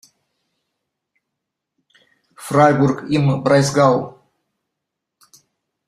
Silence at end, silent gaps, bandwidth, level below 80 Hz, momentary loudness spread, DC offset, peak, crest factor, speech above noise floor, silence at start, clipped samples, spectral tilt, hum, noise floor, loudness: 1.75 s; none; 13.5 kHz; -56 dBFS; 10 LU; under 0.1%; -2 dBFS; 20 dB; 65 dB; 2.4 s; under 0.1%; -6.5 dB/octave; none; -80 dBFS; -16 LUFS